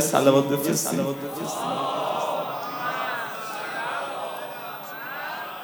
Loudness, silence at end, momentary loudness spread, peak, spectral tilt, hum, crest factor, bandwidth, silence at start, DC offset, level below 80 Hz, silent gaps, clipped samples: -26 LUFS; 0 s; 12 LU; -4 dBFS; -4 dB/octave; none; 22 dB; over 20 kHz; 0 s; under 0.1%; -76 dBFS; none; under 0.1%